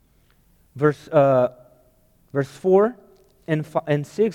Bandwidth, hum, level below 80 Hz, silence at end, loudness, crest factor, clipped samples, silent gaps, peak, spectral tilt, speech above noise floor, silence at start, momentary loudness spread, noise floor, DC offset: 14 kHz; none; -60 dBFS; 0 s; -21 LUFS; 18 dB; under 0.1%; none; -4 dBFS; -8 dB/octave; 39 dB; 0.75 s; 10 LU; -59 dBFS; under 0.1%